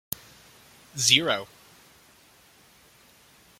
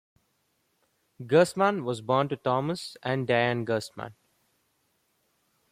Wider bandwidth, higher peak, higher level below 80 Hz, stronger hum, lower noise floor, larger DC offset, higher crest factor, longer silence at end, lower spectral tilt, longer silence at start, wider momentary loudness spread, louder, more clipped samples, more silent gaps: about the same, 16.5 kHz vs 15 kHz; first, -2 dBFS vs -10 dBFS; about the same, -66 dBFS vs -70 dBFS; neither; second, -57 dBFS vs -73 dBFS; neither; first, 30 dB vs 20 dB; first, 2.15 s vs 1.6 s; second, -1 dB/octave vs -6 dB/octave; second, 0.95 s vs 1.2 s; first, 21 LU vs 16 LU; first, -23 LUFS vs -27 LUFS; neither; neither